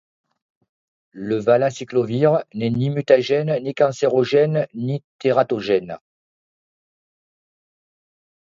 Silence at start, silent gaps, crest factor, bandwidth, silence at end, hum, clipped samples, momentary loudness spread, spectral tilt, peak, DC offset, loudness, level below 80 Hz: 1.15 s; 5.04-5.19 s; 20 dB; 7.6 kHz; 2.5 s; none; under 0.1%; 9 LU; -7 dB/octave; -2 dBFS; under 0.1%; -20 LUFS; -62 dBFS